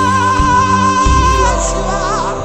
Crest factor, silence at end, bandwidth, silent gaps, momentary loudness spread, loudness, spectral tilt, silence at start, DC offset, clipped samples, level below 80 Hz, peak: 12 dB; 0 s; 11 kHz; none; 5 LU; -12 LUFS; -4.5 dB/octave; 0 s; 0.9%; under 0.1%; -20 dBFS; 0 dBFS